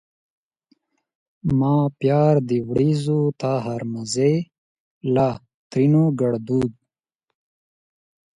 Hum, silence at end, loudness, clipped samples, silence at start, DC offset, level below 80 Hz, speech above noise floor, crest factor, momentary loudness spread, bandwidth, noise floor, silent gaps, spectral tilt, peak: none; 1.65 s; -21 LUFS; under 0.1%; 1.45 s; under 0.1%; -54 dBFS; 62 dB; 18 dB; 11 LU; 11 kHz; -81 dBFS; 4.58-5.01 s, 5.54-5.70 s; -7.5 dB/octave; -4 dBFS